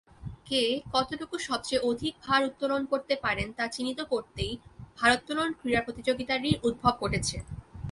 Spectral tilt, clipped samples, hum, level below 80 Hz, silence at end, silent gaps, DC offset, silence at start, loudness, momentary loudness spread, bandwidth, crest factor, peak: -4 dB/octave; under 0.1%; none; -48 dBFS; 0 s; none; under 0.1%; 0.2 s; -29 LUFS; 9 LU; 11.5 kHz; 22 dB; -8 dBFS